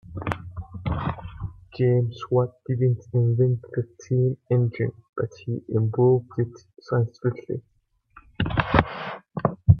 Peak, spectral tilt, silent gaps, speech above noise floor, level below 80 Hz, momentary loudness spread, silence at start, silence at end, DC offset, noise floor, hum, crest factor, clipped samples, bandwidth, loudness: 0 dBFS; -9 dB/octave; 5.09-5.13 s; 32 dB; -44 dBFS; 13 LU; 0.1 s; 0 s; under 0.1%; -56 dBFS; none; 24 dB; under 0.1%; 6.6 kHz; -25 LUFS